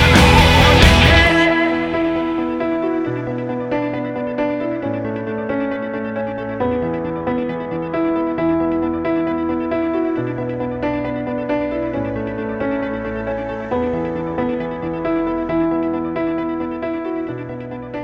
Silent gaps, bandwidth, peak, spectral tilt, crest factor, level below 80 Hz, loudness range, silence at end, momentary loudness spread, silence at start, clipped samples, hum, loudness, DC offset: none; 16.5 kHz; 0 dBFS; -5.5 dB/octave; 18 dB; -28 dBFS; 7 LU; 0 s; 13 LU; 0 s; under 0.1%; none; -18 LUFS; under 0.1%